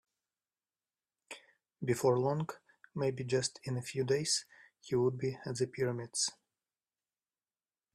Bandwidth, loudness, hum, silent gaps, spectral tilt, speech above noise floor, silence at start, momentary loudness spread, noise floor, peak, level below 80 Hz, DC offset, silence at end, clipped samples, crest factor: 14 kHz; -35 LUFS; none; none; -4.5 dB/octave; over 56 dB; 1.3 s; 17 LU; under -90 dBFS; -18 dBFS; -72 dBFS; under 0.1%; 1.6 s; under 0.1%; 20 dB